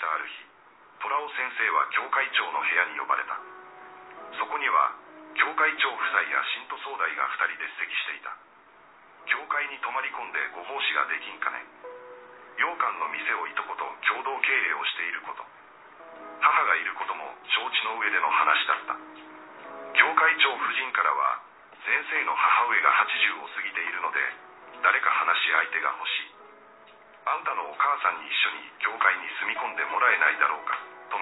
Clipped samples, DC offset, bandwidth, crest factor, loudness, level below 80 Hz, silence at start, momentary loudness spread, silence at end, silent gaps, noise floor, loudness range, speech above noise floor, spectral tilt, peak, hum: under 0.1%; under 0.1%; 4.1 kHz; 26 dB; -25 LUFS; -84 dBFS; 0 s; 19 LU; 0 s; none; -54 dBFS; 6 LU; 28 dB; -3 dB/octave; -2 dBFS; none